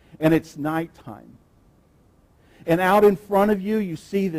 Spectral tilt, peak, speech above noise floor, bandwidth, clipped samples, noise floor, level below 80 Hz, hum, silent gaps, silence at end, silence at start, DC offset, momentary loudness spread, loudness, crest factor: -7 dB/octave; -6 dBFS; 36 dB; 16 kHz; under 0.1%; -57 dBFS; -54 dBFS; none; none; 0 s; 0.2 s; under 0.1%; 19 LU; -21 LUFS; 16 dB